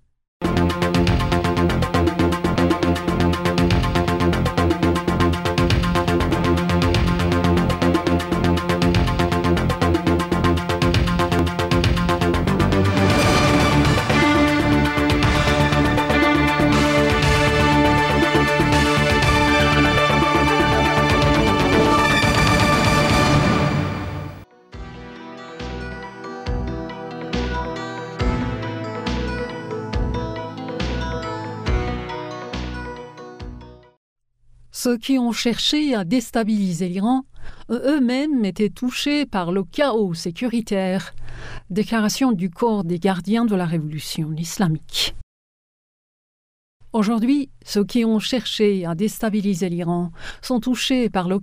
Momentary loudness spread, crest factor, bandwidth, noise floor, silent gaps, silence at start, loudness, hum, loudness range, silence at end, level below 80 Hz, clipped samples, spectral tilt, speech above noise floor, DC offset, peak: 13 LU; 14 dB; 16 kHz; -51 dBFS; 33.97-34.16 s, 45.23-46.80 s; 0.4 s; -19 LUFS; none; 10 LU; 0 s; -32 dBFS; under 0.1%; -5.5 dB/octave; 30 dB; under 0.1%; -6 dBFS